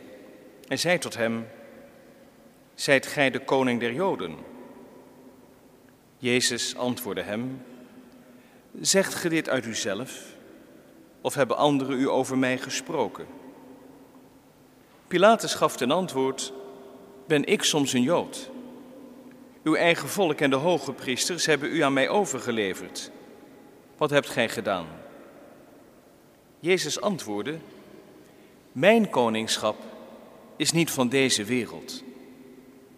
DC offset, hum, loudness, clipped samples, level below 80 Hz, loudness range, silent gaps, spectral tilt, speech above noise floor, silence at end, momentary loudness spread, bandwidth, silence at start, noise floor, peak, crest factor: under 0.1%; none; -25 LUFS; under 0.1%; -70 dBFS; 6 LU; none; -3.5 dB/octave; 30 dB; 0.25 s; 21 LU; 15.5 kHz; 0 s; -55 dBFS; -2 dBFS; 24 dB